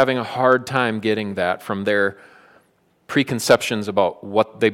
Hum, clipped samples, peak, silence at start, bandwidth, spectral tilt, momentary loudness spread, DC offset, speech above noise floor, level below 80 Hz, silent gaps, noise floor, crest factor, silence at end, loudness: none; under 0.1%; -2 dBFS; 0 s; 16.5 kHz; -4.5 dB/octave; 6 LU; under 0.1%; 42 dB; -64 dBFS; none; -61 dBFS; 18 dB; 0 s; -20 LUFS